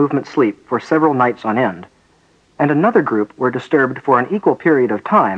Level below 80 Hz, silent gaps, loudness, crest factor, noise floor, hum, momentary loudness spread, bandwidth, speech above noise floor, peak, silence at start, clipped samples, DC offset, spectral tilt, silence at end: -62 dBFS; none; -16 LUFS; 16 dB; -55 dBFS; none; 6 LU; 8 kHz; 39 dB; 0 dBFS; 0 s; under 0.1%; under 0.1%; -8 dB/octave; 0 s